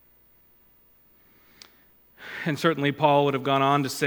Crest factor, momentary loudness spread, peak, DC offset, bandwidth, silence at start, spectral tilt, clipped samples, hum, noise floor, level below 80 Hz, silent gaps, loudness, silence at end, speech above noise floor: 20 dB; 13 LU; -6 dBFS; under 0.1%; 19.5 kHz; 2.2 s; -5.5 dB/octave; under 0.1%; none; -59 dBFS; -70 dBFS; none; -23 LUFS; 0 s; 36 dB